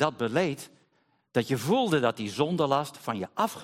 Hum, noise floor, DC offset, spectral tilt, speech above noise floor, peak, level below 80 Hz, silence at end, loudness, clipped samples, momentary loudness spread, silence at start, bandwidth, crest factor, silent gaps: none; -70 dBFS; under 0.1%; -5.5 dB/octave; 43 dB; -10 dBFS; -70 dBFS; 0 s; -28 LUFS; under 0.1%; 9 LU; 0 s; 16.5 kHz; 18 dB; none